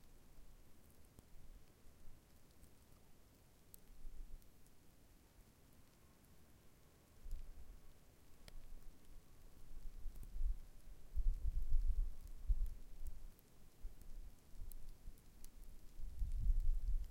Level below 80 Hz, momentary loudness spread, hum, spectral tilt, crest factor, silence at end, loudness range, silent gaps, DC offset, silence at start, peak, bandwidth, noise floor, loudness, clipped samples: -46 dBFS; 23 LU; none; -6 dB/octave; 20 dB; 0 s; 18 LU; none; under 0.1%; 0.05 s; -24 dBFS; 16 kHz; -66 dBFS; -51 LUFS; under 0.1%